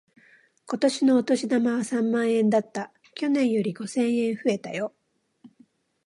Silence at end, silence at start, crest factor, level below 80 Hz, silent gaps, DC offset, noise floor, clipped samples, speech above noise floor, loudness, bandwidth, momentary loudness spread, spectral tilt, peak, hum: 0.6 s; 0.65 s; 16 dB; -78 dBFS; none; under 0.1%; -60 dBFS; under 0.1%; 37 dB; -25 LUFS; 11.5 kHz; 12 LU; -5.5 dB/octave; -10 dBFS; none